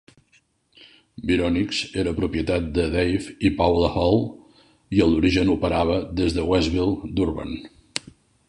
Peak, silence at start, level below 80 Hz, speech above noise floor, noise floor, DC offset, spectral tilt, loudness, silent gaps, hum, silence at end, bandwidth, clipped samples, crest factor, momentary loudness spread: -4 dBFS; 1.2 s; -36 dBFS; 41 dB; -62 dBFS; under 0.1%; -6 dB/octave; -22 LUFS; none; none; 0.5 s; 11 kHz; under 0.1%; 18 dB; 13 LU